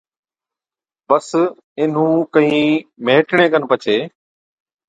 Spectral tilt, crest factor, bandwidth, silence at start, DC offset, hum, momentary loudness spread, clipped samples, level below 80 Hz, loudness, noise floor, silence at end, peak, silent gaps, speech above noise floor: -6 dB/octave; 18 dB; 9.2 kHz; 1.1 s; under 0.1%; none; 6 LU; under 0.1%; -64 dBFS; -16 LUFS; under -90 dBFS; 0.8 s; 0 dBFS; 1.64-1.76 s; over 75 dB